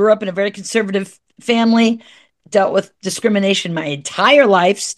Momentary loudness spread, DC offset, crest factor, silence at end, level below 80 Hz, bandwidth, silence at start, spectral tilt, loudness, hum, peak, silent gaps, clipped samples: 12 LU; under 0.1%; 16 dB; 0.05 s; -66 dBFS; 12.5 kHz; 0 s; -4 dB/octave; -15 LUFS; none; 0 dBFS; none; under 0.1%